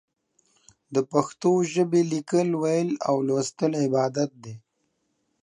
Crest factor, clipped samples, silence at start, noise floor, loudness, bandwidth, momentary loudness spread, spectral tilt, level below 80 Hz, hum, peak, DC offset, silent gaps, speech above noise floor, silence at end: 20 dB; under 0.1%; 0.9 s; -74 dBFS; -24 LUFS; 11 kHz; 7 LU; -6 dB/octave; -74 dBFS; none; -4 dBFS; under 0.1%; none; 50 dB; 0.85 s